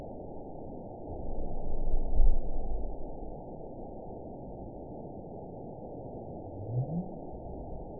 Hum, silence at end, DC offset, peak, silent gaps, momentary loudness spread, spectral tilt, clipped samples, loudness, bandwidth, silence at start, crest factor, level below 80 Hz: none; 0 s; 0.2%; -10 dBFS; none; 10 LU; -15.5 dB/octave; under 0.1%; -40 LUFS; 1 kHz; 0 s; 20 dB; -34 dBFS